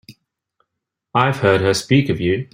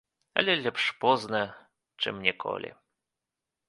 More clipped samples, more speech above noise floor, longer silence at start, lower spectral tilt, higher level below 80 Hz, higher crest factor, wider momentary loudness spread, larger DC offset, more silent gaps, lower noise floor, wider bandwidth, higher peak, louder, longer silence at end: neither; first, 64 dB vs 59 dB; second, 0.1 s vs 0.35 s; first, -5.5 dB/octave vs -4 dB/octave; first, -50 dBFS vs -70 dBFS; second, 18 dB vs 28 dB; second, 5 LU vs 11 LU; neither; neither; second, -80 dBFS vs -88 dBFS; first, 16 kHz vs 11.5 kHz; first, 0 dBFS vs -4 dBFS; first, -17 LUFS vs -28 LUFS; second, 0.1 s vs 0.95 s